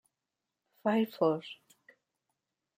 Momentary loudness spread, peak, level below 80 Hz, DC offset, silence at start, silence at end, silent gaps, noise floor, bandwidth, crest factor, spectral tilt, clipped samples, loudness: 19 LU; -14 dBFS; -82 dBFS; under 0.1%; 0.85 s; 1.25 s; none; -88 dBFS; 16 kHz; 22 dB; -7 dB/octave; under 0.1%; -32 LUFS